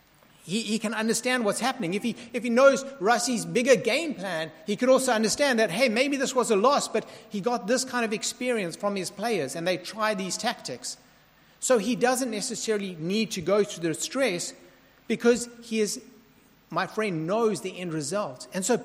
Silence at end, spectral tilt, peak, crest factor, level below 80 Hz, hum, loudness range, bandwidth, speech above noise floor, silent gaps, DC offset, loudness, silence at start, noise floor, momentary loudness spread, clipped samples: 0 s; -3.5 dB/octave; -6 dBFS; 20 dB; -68 dBFS; none; 5 LU; 16 kHz; 32 dB; none; under 0.1%; -26 LUFS; 0.45 s; -58 dBFS; 10 LU; under 0.1%